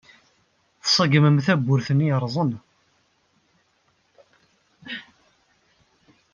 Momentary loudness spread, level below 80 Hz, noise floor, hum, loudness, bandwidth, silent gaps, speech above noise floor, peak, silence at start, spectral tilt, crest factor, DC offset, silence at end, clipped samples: 19 LU; -66 dBFS; -66 dBFS; none; -20 LUFS; 7.2 kHz; none; 47 dB; -4 dBFS; 0.85 s; -5.5 dB/octave; 20 dB; under 0.1%; 1.3 s; under 0.1%